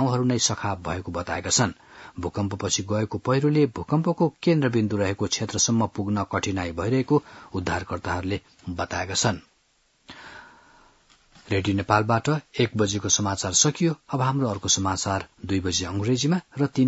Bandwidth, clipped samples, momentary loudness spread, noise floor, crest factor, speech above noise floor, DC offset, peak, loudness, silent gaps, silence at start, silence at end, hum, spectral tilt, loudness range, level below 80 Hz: 8 kHz; under 0.1%; 9 LU; -66 dBFS; 22 dB; 41 dB; under 0.1%; -4 dBFS; -24 LUFS; none; 0 s; 0 s; none; -4 dB/octave; 7 LU; -56 dBFS